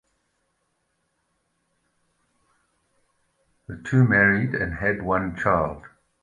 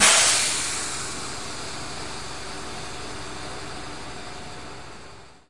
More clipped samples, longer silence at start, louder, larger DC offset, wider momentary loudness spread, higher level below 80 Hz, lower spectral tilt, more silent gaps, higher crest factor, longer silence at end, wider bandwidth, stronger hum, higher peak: neither; first, 3.7 s vs 0 s; first, -22 LUFS vs -25 LUFS; second, under 0.1% vs 1%; about the same, 18 LU vs 20 LU; about the same, -48 dBFS vs -50 dBFS; first, -8.5 dB/octave vs 0 dB/octave; neither; about the same, 22 dB vs 24 dB; first, 0.35 s vs 0 s; second, 9.6 kHz vs 12 kHz; neither; about the same, -4 dBFS vs -2 dBFS